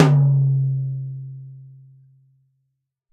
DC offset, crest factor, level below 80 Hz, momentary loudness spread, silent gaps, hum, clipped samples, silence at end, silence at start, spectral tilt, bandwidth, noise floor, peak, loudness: under 0.1%; 22 dB; -60 dBFS; 22 LU; none; none; under 0.1%; 1.45 s; 0 s; -8.5 dB/octave; 6.8 kHz; -75 dBFS; 0 dBFS; -20 LUFS